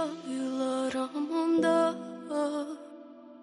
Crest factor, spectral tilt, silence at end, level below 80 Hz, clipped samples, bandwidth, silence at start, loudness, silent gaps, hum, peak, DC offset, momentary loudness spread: 16 dB; -5 dB/octave; 0 s; -76 dBFS; under 0.1%; 11.5 kHz; 0 s; -30 LUFS; none; none; -14 dBFS; under 0.1%; 19 LU